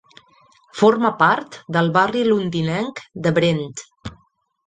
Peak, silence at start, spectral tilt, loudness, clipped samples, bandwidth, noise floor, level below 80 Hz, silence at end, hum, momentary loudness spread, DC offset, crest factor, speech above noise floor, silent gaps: -2 dBFS; 0.75 s; -6 dB/octave; -19 LUFS; under 0.1%; 9.4 kHz; -60 dBFS; -56 dBFS; 0.55 s; none; 19 LU; under 0.1%; 18 dB; 42 dB; none